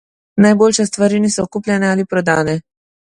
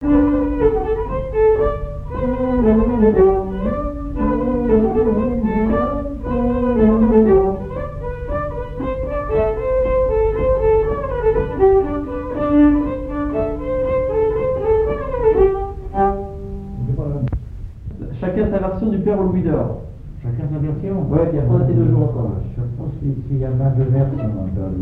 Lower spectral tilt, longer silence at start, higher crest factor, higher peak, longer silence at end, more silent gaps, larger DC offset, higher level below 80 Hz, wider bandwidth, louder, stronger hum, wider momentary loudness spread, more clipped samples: second, -5 dB/octave vs -11.5 dB/octave; first, 0.35 s vs 0 s; about the same, 14 dB vs 16 dB; about the same, 0 dBFS vs -2 dBFS; first, 0.5 s vs 0 s; neither; neither; second, -52 dBFS vs -28 dBFS; first, 11.5 kHz vs 4.2 kHz; first, -15 LUFS vs -18 LUFS; neither; about the same, 9 LU vs 11 LU; neither